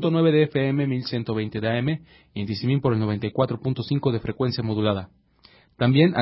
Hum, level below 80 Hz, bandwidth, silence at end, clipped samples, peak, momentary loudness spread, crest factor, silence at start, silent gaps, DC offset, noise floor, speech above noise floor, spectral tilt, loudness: none; -52 dBFS; 5.8 kHz; 0 s; under 0.1%; -6 dBFS; 9 LU; 18 dB; 0 s; none; under 0.1%; -56 dBFS; 33 dB; -11.5 dB/octave; -24 LUFS